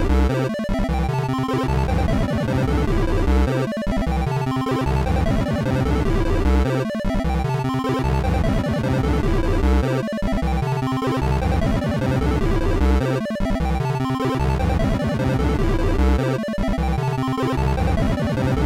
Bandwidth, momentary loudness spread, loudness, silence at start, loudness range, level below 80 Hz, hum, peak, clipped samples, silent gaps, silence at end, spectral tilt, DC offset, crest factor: 14.5 kHz; 3 LU; -21 LUFS; 0 s; 0 LU; -24 dBFS; none; -12 dBFS; under 0.1%; none; 0 s; -7.5 dB/octave; 0.2%; 8 dB